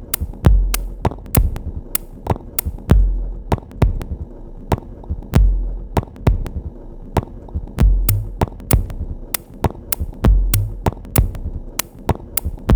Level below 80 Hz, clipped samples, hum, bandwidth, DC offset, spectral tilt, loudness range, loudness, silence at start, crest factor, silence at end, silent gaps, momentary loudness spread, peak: -20 dBFS; under 0.1%; none; over 20 kHz; under 0.1%; -5.5 dB/octave; 3 LU; -21 LUFS; 0 s; 18 dB; 0 s; none; 13 LU; 0 dBFS